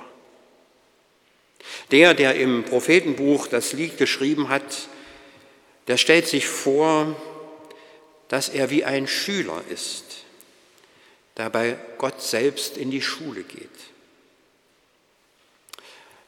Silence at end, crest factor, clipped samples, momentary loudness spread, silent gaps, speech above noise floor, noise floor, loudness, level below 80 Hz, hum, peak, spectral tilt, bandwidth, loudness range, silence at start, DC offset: 2.45 s; 24 dB; under 0.1%; 23 LU; none; 41 dB; -63 dBFS; -21 LUFS; -74 dBFS; none; 0 dBFS; -3.5 dB/octave; 18 kHz; 10 LU; 0 s; under 0.1%